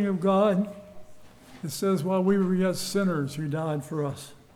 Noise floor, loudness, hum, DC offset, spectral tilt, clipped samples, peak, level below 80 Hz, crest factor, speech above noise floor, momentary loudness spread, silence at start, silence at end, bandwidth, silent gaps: -48 dBFS; -26 LUFS; none; under 0.1%; -6.5 dB/octave; under 0.1%; -12 dBFS; -62 dBFS; 14 dB; 23 dB; 12 LU; 0 s; 0.2 s; 15.5 kHz; none